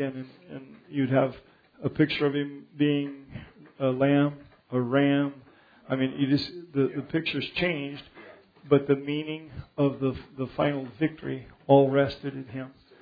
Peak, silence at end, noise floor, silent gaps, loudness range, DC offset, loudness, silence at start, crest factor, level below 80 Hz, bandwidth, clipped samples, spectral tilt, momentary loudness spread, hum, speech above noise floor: -6 dBFS; 0.3 s; -50 dBFS; none; 2 LU; under 0.1%; -27 LUFS; 0 s; 22 dB; -60 dBFS; 5 kHz; under 0.1%; -9 dB/octave; 18 LU; none; 24 dB